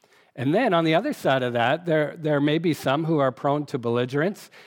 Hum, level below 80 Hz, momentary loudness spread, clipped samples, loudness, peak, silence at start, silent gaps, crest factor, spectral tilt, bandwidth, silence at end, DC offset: none; -74 dBFS; 5 LU; under 0.1%; -23 LUFS; -6 dBFS; 0.35 s; none; 16 dB; -6.5 dB/octave; 18 kHz; 0.05 s; under 0.1%